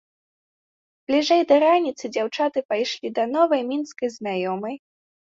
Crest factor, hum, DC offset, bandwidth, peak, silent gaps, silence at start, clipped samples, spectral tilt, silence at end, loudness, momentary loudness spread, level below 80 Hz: 18 dB; none; under 0.1%; 7.8 kHz; -6 dBFS; 2.65-2.69 s; 1.1 s; under 0.1%; -4.5 dB/octave; 0.65 s; -22 LUFS; 12 LU; -72 dBFS